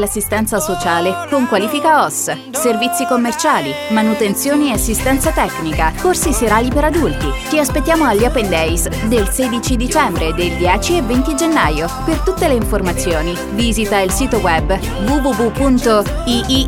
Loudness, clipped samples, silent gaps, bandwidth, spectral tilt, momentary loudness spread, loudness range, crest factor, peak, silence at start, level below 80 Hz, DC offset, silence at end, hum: -15 LUFS; under 0.1%; none; 18 kHz; -4 dB/octave; 4 LU; 1 LU; 14 dB; 0 dBFS; 0 s; -24 dBFS; under 0.1%; 0 s; none